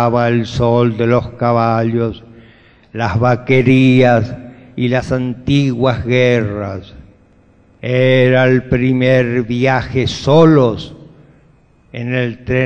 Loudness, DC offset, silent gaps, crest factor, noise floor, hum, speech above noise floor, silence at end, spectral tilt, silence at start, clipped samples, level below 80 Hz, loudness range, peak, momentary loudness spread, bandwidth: -13 LUFS; under 0.1%; none; 14 dB; -49 dBFS; none; 36 dB; 0 s; -7.5 dB/octave; 0 s; under 0.1%; -40 dBFS; 4 LU; 0 dBFS; 16 LU; 8 kHz